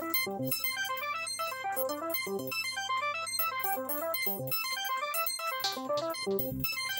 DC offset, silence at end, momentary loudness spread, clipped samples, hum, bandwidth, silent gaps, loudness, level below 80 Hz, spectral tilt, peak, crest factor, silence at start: under 0.1%; 0 s; 3 LU; under 0.1%; none; 17 kHz; none; -32 LUFS; -66 dBFS; -2.5 dB/octave; -16 dBFS; 18 dB; 0 s